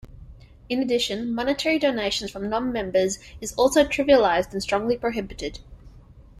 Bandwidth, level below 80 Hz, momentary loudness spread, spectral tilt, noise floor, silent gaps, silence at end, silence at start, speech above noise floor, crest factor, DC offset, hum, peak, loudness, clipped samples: 14.5 kHz; -46 dBFS; 12 LU; -3.5 dB/octave; -48 dBFS; none; 0 s; 0.05 s; 25 dB; 20 dB; under 0.1%; none; -4 dBFS; -23 LUFS; under 0.1%